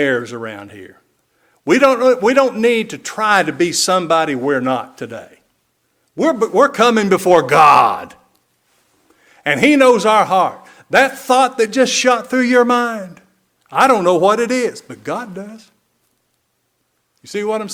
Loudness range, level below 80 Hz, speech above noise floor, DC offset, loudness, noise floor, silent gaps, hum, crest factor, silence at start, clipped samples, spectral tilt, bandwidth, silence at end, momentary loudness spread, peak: 4 LU; -60 dBFS; 53 dB; under 0.1%; -14 LUFS; -67 dBFS; none; none; 16 dB; 0 s; 0.2%; -3.5 dB/octave; 18 kHz; 0 s; 18 LU; 0 dBFS